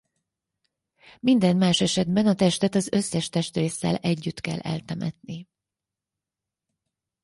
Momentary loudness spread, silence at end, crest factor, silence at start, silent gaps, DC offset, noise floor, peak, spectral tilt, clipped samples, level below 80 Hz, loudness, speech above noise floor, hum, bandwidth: 12 LU; 1.8 s; 18 dB; 1.25 s; none; under 0.1%; -88 dBFS; -8 dBFS; -5.5 dB/octave; under 0.1%; -60 dBFS; -24 LUFS; 65 dB; none; 11.5 kHz